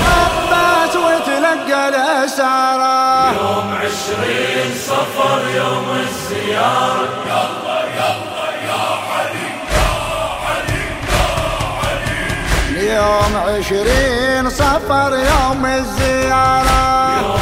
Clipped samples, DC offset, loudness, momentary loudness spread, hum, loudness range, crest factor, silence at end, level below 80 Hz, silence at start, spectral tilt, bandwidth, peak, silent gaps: under 0.1%; under 0.1%; -15 LUFS; 6 LU; none; 4 LU; 14 dB; 0 s; -28 dBFS; 0 s; -4 dB/octave; 16 kHz; -2 dBFS; none